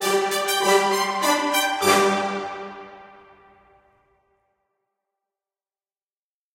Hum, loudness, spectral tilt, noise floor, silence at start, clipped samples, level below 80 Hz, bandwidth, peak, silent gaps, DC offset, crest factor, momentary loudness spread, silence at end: none; -20 LUFS; -2 dB/octave; under -90 dBFS; 0 s; under 0.1%; -68 dBFS; 16 kHz; -4 dBFS; none; under 0.1%; 20 dB; 15 LU; 3.5 s